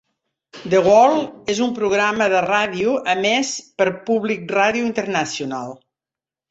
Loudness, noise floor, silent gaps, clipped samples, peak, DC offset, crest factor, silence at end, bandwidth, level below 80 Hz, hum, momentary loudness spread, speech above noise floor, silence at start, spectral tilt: -18 LUFS; -90 dBFS; none; under 0.1%; -2 dBFS; under 0.1%; 16 dB; 0.75 s; 8.2 kHz; -60 dBFS; none; 11 LU; 71 dB; 0.55 s; -4 dB/octave